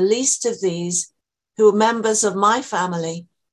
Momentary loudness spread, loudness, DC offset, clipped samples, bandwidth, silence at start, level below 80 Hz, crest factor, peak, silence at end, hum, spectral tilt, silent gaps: 13 LU; -19 LUFS; under 0.1%; under 0.1%; 12 kHz; 0 s; -68 dBFS; 16 dB; -4 dBFS; 0.3 s; none; -3.5 dB/octave; none